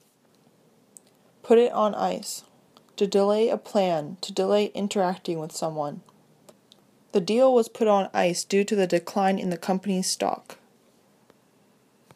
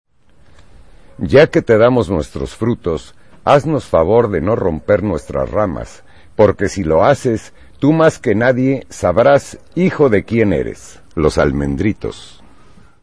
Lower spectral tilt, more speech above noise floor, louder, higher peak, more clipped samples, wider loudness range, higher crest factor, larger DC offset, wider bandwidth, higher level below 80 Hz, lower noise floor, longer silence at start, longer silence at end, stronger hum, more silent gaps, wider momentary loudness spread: second, -5 dB/octave vs -7 dB/octave; first, 38 dB vs 34 dB; second, -24 LUFS vs -15 LUFS; second, -6 dBFS vs 0 dBFS; neither; first, 5 LU vs 2 LU; about the same, 20 dB vs 16 dB; second, under 0.1% vs 0.9%; first, 15.5 kHz vs 11 kHz; second, -78 dBFS vs -36 dBFS; first, -61 dBFS vs -48 dBFS; first, 1.45 s vs 1.2 s; first, 1.6 s vs 0.75 s; neither; neither; second, 11 LU vs 14 LU